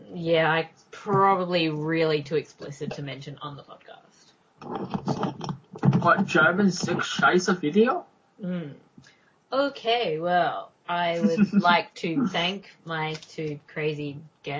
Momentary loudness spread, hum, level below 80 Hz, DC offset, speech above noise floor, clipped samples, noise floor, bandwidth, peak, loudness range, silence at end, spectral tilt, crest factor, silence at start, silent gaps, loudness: 16 LU; none; -64 dBFS; under 0.1%; 34 dB; under 0.1%; -59 dBFS; 7.8 kHz; -6 dBFS; 8 LU; 0 s; -5.5 dB/octave; 20 dB; 0 s; none; -25 LUFS